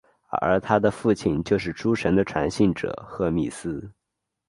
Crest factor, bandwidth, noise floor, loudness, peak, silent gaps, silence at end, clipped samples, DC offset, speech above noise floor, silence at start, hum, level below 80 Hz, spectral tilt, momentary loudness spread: 20 dB; 11.5 kHz; -82 dBFS; -24 LUFS; -4 dBFS; none; 0.6 s; under 0.1%; under 0.1%; 59 dB; 0.3 s; none; -48 dBFS; -6.5 dB/octave; 10 LU